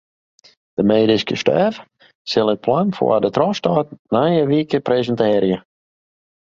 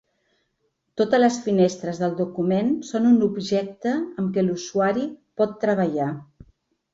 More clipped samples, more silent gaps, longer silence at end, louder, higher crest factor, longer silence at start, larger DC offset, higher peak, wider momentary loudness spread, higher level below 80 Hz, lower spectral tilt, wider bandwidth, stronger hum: neither; first, 2.15-2.25 s, 3.99-4.05 s vs none; first, 0.9 s vs 0.7 s; first, -18 LUFS vs -23 LUFS; about the same, 16 dB vs 16 dB; second, 0.8 s vs 0.95 s; neither; first, -2 dBFS vs -6 dBFS; about the same, 6 LU vs 8 LU; first, -56 dBFS vs -64 dBFS; about the same, -6.5 dB/octave vs -6.5 dB/octave; about the same, 7.6 kHz vs 7.8 kHz; neither